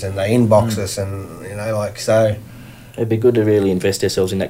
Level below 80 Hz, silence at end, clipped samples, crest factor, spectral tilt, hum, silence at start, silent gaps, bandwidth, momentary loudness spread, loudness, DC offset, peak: -46 dBFS; 0 s; under 0.1%; 18 dB; -6 dB/octave; none; 0 s; none; 16 kHz; 15 LU; -17 LUFS; under 0.1%; 0 dBFS